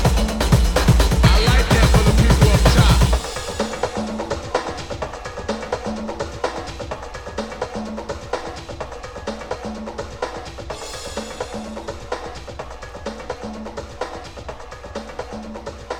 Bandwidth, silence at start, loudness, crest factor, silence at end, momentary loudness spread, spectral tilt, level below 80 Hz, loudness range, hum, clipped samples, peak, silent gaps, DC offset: 18.5 kHz; 0 s; -21 LUFS; 20 dB; 0 s; 18 LU; -5 dB/octave; -24 dBFS; 16 LU; none; under 0.1%; 0 dBFS; none; under 0.1%